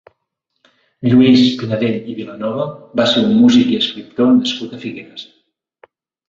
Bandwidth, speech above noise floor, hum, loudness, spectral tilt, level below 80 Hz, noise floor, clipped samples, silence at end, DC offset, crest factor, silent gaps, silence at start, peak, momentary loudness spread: 7.6 kHz; 59 dB; none; -14 LUFS; -6 dB/octave; -56 dBFS; -73 dBFS; under 0.1%; 1.05 s; under 0.1%; 14 dB; none; 1 s; -2 dBFS; 18 LU